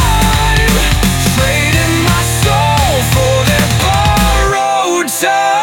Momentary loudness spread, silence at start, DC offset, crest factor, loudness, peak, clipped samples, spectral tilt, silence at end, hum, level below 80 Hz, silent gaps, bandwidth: 2 LU; 0 s; under 0.1%; 10 dB; -11 LUFS; 0 dBFS; under 0.1%; -4 dB/octave; 0 s; none; -18 dBFS; none; 18 kHz